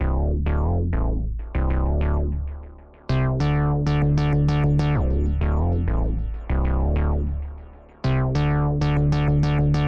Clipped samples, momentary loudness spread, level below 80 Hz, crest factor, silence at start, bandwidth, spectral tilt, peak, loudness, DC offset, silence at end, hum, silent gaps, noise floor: under 0.1%; 9 LU; -26 dBFS; 10 dB; 0 s; 6.8 kHz; -9 dB/octave; -10 dBFS; -23 LUFS; under 0.1%; 0 s; none; none; -41 dBFS